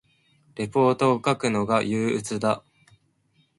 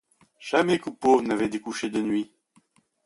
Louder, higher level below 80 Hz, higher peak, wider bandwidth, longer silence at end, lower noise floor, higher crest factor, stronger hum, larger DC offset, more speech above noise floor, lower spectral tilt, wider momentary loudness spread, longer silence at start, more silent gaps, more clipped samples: about the same, -24 LUFS vs -25 LUFS; about the same, -62 dBFS vs -66 dBFS; about the same, -6 dBFS vs -6 dBFS; about the same, 11.5 kHz vs 11.5 kHz; first, 1 s vs 0.8 s; about the same, -66 dBFS vs -64 dBFS; about the same, 18 dB vs 20 dB; neither; neither; about the same, 43 dB vs 40 dB; about the same, -5.5 dB/octave vs -5 dB/octave; about the same, 10 LU vs 9 LU; first, 0.55 s vs 0.4 s; neither; neither